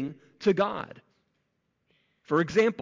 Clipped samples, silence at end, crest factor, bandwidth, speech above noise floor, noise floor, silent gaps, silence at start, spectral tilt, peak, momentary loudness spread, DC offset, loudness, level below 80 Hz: under 0.1%; 0 s; 18 dB; 7.6 kHz; 51 dB; -76 dBFS; none; 0 s; -6.5 dB/octave; -12 dBFS; 14 LU; under 0.1%; -27 LUFS; -66 dBFS